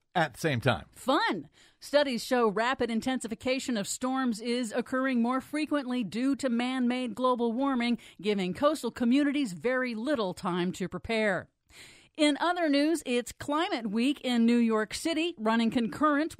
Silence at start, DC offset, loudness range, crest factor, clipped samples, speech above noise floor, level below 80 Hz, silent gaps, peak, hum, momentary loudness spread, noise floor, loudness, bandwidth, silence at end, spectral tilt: 0.15 s; under 0.1%; 2 LU; 18 dB; under 0.1%; 25 dB; -62 dBFS; none; -10 dBFS; none; 6 LU; -54 dBFS; -29 LUFS; 15.5 kHz; 0.05 s; -4.5 dB/octave